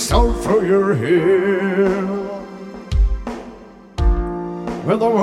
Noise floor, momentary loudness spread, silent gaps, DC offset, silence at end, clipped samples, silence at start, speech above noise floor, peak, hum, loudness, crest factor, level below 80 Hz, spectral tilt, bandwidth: -39 dBFS; 16 LU; none; under 0.1%; 0 s; under 0.1%; 0 s; 24 dB; -2 dBFS; none; -18 LUFS; 16 dB; -24 dBFS; -6 dB/octave; 14 kHz